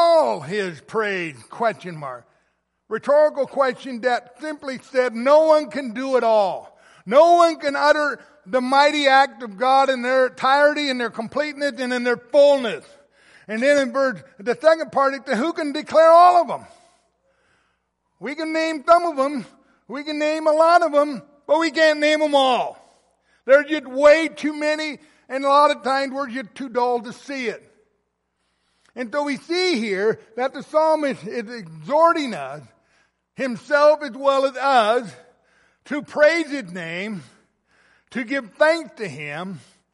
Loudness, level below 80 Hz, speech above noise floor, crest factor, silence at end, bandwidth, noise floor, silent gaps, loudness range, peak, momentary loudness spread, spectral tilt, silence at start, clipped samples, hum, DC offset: -19 LUFS; -70 dBFS; 53 dB; 18 dB; 0.35 s; 11.5 kHz; -72 dBFS; none; 7 LU; -2 dBFS; 16 LU; -4 dB/octave; 0 s; under 0.1%; none; under 0.1%